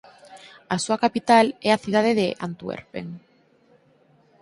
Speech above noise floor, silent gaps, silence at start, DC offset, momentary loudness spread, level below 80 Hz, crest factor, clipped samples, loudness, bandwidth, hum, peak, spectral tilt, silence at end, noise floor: 37 dB; none; 0.3 s; under 0.1%; 18 LU; -64 dBFS; 20 dB; under 0.1%; -22 LUFS; 11.5 kHz; none; -4 dBFS; -4.5 dB/octave; 1.25 s; -59 dBFS